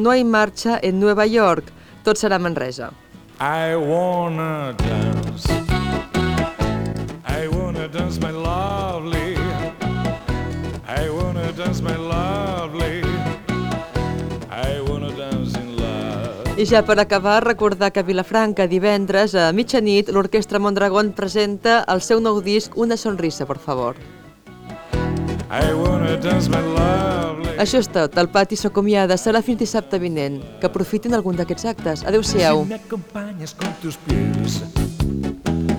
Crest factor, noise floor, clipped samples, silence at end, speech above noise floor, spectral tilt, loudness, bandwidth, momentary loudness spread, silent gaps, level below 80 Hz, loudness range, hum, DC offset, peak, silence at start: 18 dB; -41 dBFS; under 0.1%; 0 s; 23 dB; -5.5 dB/octave; -20 LUFS; 19.5 kHz; 9 LU; none; -34 dBFS; 6 LU; none; under 0.1%; -2 dBFS; 0 s